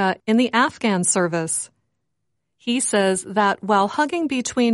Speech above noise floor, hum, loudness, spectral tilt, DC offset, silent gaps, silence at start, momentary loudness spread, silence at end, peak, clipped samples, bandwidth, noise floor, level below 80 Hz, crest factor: 58 dB; none; -20 LUFS; -3.5 dB/octave; under 0.1%; none; 0 s; 6 LU; 0 s; -4 dBFS; under 0.1%; 11.5 kHz; -78 dBFS; -64 dBFS; 16 dB